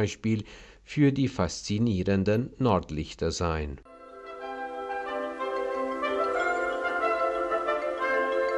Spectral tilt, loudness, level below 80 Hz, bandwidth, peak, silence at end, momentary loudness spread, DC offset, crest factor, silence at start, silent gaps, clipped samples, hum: -6 dB/octave; -28 LUFS; -50 dBFS; 12 kHz; -10 dBFS; 0 s; 11 LU; under 0.1%; 18 dB; 0 s; none; under 0.1%; none